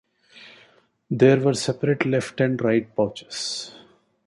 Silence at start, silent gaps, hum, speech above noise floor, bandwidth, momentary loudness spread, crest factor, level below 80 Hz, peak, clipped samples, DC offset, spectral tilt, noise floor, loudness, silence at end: 0.35 s; none; none; 36 dB; 11.5 kHz; 13 LU; 20 dB; -62 dBFS; -4 dBFS; under 0.1%; under 0.1%; -5.5 dB/octave; -58 dBFS; -22 LUFS; 0.5 s